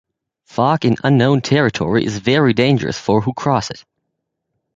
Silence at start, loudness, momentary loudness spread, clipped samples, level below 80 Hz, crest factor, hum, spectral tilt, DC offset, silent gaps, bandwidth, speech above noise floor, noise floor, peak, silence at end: 0.55 s; -16 LUFS; 6 LU; under 0.1%; -48 dBFS; 16 dB; none; -6.5 dB/octave; under 0.1%; none; 7.8 kHz; 60 dB; -75 dBFS; 0 dBFS; 0.95 s